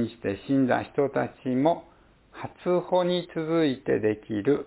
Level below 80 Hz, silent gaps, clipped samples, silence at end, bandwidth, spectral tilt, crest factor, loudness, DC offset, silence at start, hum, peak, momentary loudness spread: -60 dBFS; none; under 0.1%; 0 s; 4 kHz; -11 dB/octave; 18 dB; -26 LUFS; under 0.1%; 0 s; none; -8 dBFS; 9 LU